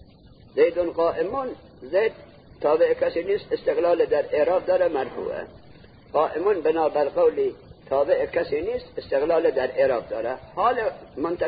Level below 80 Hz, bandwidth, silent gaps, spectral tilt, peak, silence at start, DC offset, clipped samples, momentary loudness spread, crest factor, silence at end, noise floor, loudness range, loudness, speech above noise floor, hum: -54 dBFS; 5 kHz; none; -10 dB/octave; -8 dBFS; 0.55 s; under 0.1%; under 0.1%; 9 LU; 16 dB; 0 s; -50 dBFS; 2 LU; -24 LUFS; 27 dB; none